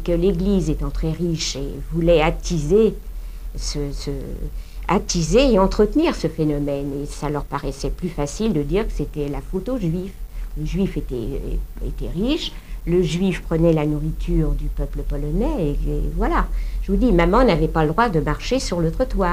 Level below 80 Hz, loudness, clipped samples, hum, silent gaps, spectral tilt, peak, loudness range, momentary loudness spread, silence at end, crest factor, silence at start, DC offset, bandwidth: -26 dBFS; -21 LUFS; under 0.1%; none; none; -6 dB/octave; -2 dBFS; 5 LU; 13 LU; 0 s; 18 dB; 0 s; 0.7%; 15.5 kHz